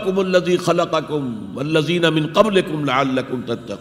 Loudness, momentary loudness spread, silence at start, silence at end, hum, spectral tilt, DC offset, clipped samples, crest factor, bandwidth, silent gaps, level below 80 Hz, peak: -19 LUFS; 9 LU; 0 s; 0 s; none; -5.5 dB/octave; under 0.1%; under 0.1%; 18 dB; 15.5 kHz; none; -54 dBFS; 0 dBFS